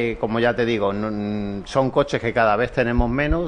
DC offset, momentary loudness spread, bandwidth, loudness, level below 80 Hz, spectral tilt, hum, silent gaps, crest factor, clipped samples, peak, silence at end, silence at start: under 0.1%; 6 LU; 10 kHz; -21 LUFS; -32 dBFS; -7 dB/octave; none; none; 16 dB; under 0.1%; -4 dBFS; 0 s; 0 s